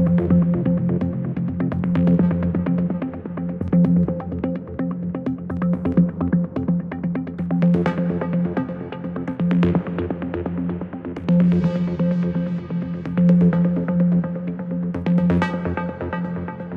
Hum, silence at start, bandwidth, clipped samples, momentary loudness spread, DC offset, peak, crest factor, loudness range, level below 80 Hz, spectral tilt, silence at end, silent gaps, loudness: none; 0 s; 4.2 kHz; under 0.1%; 10 LU; under 0.1%; -6 dBFS; 16 dB; 3 LU; -44 dBFS; -10.5 dB/octave; 0 s; none; -21 LUFS